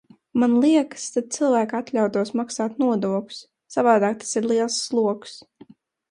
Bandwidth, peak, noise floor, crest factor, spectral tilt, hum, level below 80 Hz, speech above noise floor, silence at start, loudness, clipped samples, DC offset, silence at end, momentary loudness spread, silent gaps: 11.5 kHz; -4 dBFS; -51 dBFS; 18 dB; -4.5 dB/octave; none; -70 dBFS; 29 dB; 0.35 s; -22 LUFS; under 0.1%; under 0.1%; 0.75 s; 10 LU; none